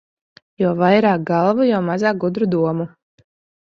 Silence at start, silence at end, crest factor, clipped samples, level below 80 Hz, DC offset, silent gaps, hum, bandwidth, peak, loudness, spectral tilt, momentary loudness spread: 0.6 s; 0.75 s; 16 dB; under 0.1%; -60 dBFS; under 0.1%; none; none; 7.2 kHz; -2 dBFS; -18 LUFS; -8 dB/octave; 7 LU